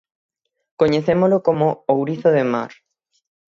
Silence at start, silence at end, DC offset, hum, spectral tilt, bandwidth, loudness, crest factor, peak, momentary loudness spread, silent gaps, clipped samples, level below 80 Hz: 0.8 s; 0.8 s; under 0.1%; none; -8 dB/octave; 7.2 kHz; -18 LUFS; 16 dB; -4 dBFS; 6 LU; none; under 0.1%; -58 dBFS